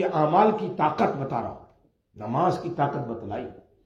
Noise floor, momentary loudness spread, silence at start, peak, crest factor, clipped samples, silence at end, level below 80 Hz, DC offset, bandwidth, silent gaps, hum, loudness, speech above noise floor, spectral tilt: -62 dBFS; 16 LU; 0 s; -6 dBFS; 20 dB; under 0.1%; 0.25 s; -62 dBFS; under 0.1%; 10.5 kHz; none; none; -25 LUFS; 37 dB; -8 dB/octave